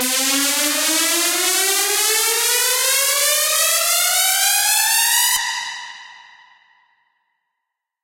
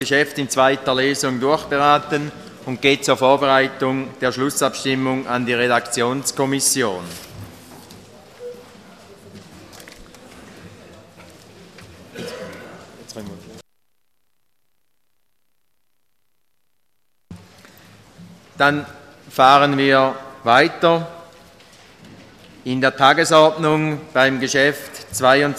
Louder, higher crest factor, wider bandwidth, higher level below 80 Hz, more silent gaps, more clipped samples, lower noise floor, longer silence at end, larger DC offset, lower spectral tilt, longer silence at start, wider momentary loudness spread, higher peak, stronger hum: about the same, -15 LUFS vs -17 LUFS; about the same, 18 dB vs 20 dB; about the same, 16.5 kHz vs 15.5 kHz; second, -66 dBFS vs -58 dBFS; neither; neither; first, -80 dBFS vs -74 dBFS; first, 1.85 s vs 0 s; neither; second, 3 dB/octave vs -3.5 dB/octave; about the same, 0 s vs 0 s; second, 3 LU vs 22 LU; about the same, 0 dBFS vs 0 dBFS; neither